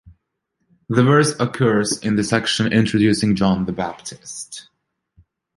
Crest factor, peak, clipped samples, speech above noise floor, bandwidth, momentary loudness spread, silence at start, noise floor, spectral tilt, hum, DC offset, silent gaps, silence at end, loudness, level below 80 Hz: 18 dB; -2 dBFS; under 0.1%; 55 dB; 11.5 kHz; 16 LU; 0.05 s; -73 dBFS; -5 dB/octave; none; under 0.1%; none; 0.95 s; -18 LUFS; -48 dBFS